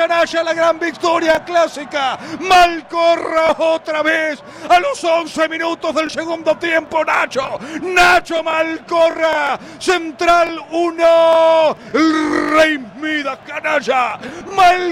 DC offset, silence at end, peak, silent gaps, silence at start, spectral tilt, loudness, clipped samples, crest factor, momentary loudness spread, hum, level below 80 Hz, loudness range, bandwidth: under 0.1%; 0 s; -4 dBFS; none; 0 s; -3 dB/octave; -15 LUFS; under 0.1%; 12 dB; 10 LU; none; -46 dBFS; 3 LU; 15.5 kHz